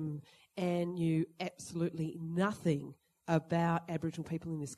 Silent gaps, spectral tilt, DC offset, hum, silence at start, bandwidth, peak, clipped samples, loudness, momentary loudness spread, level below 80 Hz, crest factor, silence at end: none; -7 dB/octave; under 0.1%; none; 0 s; 12.5 kHz; -16 dBFS; under 0.1%; -36 LUFS; 10 LU; -68 dBFS; 20 dB; 0.05 s